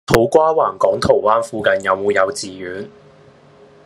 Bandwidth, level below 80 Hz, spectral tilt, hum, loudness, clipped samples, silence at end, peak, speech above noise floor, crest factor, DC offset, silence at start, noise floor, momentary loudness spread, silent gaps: 13 kHz; -46 dBFS; -5 dB/octave; none; -16 LUFS; under 0.1%; 0.95 s; 0 dBFS; 30 dB; 18 dB; under 0.1%; 0.1 s; -46 dBFS; 15 LU; none